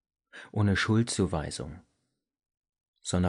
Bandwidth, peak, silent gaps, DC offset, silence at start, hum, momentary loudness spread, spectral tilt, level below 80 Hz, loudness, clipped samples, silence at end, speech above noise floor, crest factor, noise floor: 10.5 kHz; -16 dBFS; 2.57-2.61 s, 2.88-2.94 s; under 0.1%; 0.35 s; none; 16 LU; -5.5 dB/octave; -52 dBFS; -29 LUFS; under 0.1%; 0 s; 51 dB; 16 dB; -79 dBFS